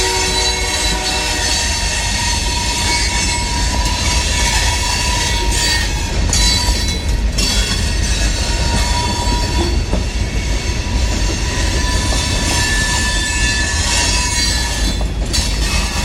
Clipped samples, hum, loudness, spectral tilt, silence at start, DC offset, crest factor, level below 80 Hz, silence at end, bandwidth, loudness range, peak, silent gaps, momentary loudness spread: under 0.1%; none; -15 LUFS; -2.5 dB/octave; 0 s; under 0.1%; 14 dB; -20 dBFS; 0 s; 16.5 kHz; 3 LU; -2 dBFS; none; 5 LU